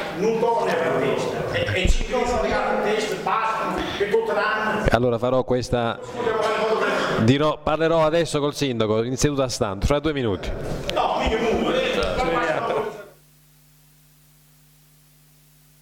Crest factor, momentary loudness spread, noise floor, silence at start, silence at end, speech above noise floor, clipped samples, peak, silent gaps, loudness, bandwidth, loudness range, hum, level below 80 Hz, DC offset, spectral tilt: 16 dB; 5 LU; -54 dBFS; 0 s; 2.7 s; 33 dB; under 0.1%; -6 dBFS; none; -22 LUFS; 18.5 kHz; 5 LU; none; -34 dBFS; under 0.1%; -5 dB/octave